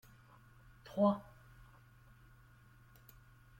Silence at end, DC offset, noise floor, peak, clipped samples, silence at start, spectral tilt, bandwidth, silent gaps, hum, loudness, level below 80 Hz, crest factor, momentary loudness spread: 2.4 s; under 0.1%; -63 dBFS; -20 dBFS; under 0.1%; 0.9 s; -8.5 dB/octave; 16.5 kHz; none; none; -36 LUFS; -68 dBFS; 22 dB; 28 LU